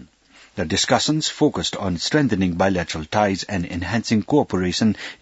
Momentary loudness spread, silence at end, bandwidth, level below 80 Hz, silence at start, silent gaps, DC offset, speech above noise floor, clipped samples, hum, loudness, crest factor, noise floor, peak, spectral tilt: 6 LU; 0.05 s; 8 kHz; -50 dBFS; 0 s; none; under 0.1%; 31 dB; under 0.1%; none; -21 LUFS; 20 dB; -52 dBFS; 0 dBFS; -4.5 dB/octave